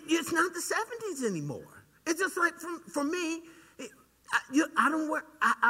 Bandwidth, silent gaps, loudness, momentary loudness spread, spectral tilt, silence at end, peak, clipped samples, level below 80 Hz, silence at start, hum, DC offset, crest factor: 16 kHz; none; -31 LUFS; 14 LU; -3.5 dB/octave; 0 s; -10 dBFS; under 0.1%; -74 dBFS; 0 s; none; under 0.1%; 22 dB